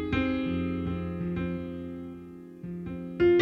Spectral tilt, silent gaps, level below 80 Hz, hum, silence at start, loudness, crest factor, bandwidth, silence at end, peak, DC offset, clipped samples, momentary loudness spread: -8.5 dB/octave; none; -48 dBFS; none; 0 s; -31 LUFS; 18 dB; 5.4 kHz; 0 s; -12 dBFS; under 0.1%; under 0.1%; 15 LU